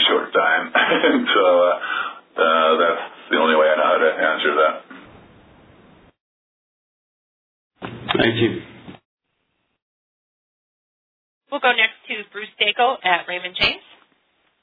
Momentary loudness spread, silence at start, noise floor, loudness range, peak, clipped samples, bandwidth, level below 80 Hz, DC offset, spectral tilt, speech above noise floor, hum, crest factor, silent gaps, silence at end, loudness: 13 LU; 0 s; -72 dBFS; 10 LU; -2 dBFS; under 0.1%; 5 kHz; -58 dBFS; under 0.1%; -6.5 dB/octave; 52 dB; none; 20 dB; 6.20-7.70 s, 9.05-9.17 s, 9.82-11.41 s; 0.85 s; -18 LUFS